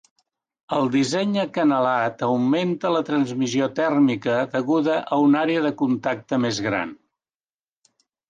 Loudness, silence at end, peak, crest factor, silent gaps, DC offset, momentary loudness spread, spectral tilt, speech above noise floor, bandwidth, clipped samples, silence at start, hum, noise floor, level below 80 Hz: -22 LUFS; 1.35 s; -8 dBFS; 14 dB; none; under 0.1%; 5 LU; -5.5 dB/octave; over 69 dB; 9.4 kHz; under 0.1%; 0.7 s; none; under -90 dBFS; -66 dBFS